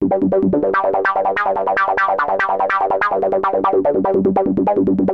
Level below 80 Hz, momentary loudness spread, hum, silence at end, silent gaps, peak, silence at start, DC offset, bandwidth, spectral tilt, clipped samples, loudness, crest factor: -50 dBFS; 1 LU; none; 0 s; none; -6 dBFS; 0 s; under 0.1%; 6.4 kHz; -8.5 dB/octave; under 0.1%; -16 LUFS; 10 dB